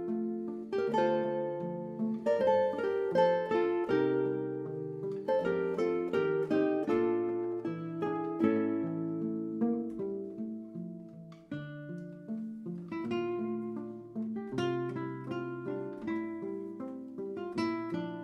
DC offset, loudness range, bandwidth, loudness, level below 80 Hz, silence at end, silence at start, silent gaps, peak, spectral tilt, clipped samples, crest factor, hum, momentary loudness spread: under 0.1%; 9 LU; 8.4 kHz; -34 LUFS; -74 dBFS; 0 s; 0 s; none; -14 dBFS; -8 dB/octave; under 0.1%; 18 dB; none; 13 LU